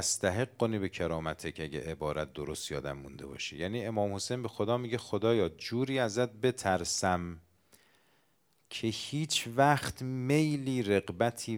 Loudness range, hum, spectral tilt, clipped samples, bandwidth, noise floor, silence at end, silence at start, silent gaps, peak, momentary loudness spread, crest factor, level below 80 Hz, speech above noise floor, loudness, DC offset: 5 LU; none; -4.5 dB/octave; under 0.1%; 17.5 kHz; -73 dBFS; 0 s; 0 s; none; -10 dBFS; 10 LU; 22 dB; -60 dBFS; 41 dB; -32 LUFS; under 0.1%